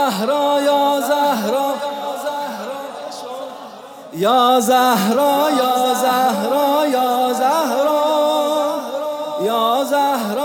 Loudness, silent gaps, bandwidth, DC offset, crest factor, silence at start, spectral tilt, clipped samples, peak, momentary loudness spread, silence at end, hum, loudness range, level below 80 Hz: -17 LUFS; none; 18 kHz; under 0.1%; 14 dB; 0 s; -3.5 dB/octave; under 0.1%; -4 dBFS; 15 LU; 0 s; none; 5 LU; -76 dBFS